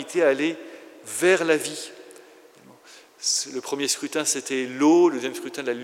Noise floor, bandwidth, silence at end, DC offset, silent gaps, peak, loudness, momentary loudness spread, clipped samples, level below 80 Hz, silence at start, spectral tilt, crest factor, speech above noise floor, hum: -51 dBFS; 16 kHz; 0 s; under 0.1%; none; -6 dBFS; -23 LUFS; 15 LU; under 0.1%; -90 dBFS; 0 s; -2.5 dB/octave; 18 dB; 28 dB; none